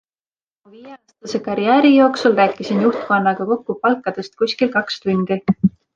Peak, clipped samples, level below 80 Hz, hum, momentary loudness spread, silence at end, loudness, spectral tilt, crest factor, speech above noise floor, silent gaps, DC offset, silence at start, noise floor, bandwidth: -2 dBFS; under 0.1%; -58 dBFS; none; 10 LU; 0.25 s; -17 LUFS; -6.5 dB/octave; 16 dB; over 73 dB; none; under 0.1%; 0.8 s; under -90 dBFS; 7.6 kHz